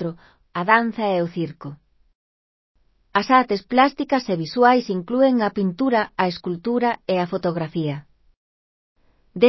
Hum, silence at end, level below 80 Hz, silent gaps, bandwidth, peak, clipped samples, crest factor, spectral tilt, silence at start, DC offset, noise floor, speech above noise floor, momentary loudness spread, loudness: none; 0 s; -60 dBFS; 2.15-2.75 s, 8.37-8.96 s; 6 kHz; -2 dBFS; under 0.1%; 20 dB; -7 dB/octave; 0 s; under 0.1%; under -90 dBFS; over 70 dB; 12 LU; -21 LUFS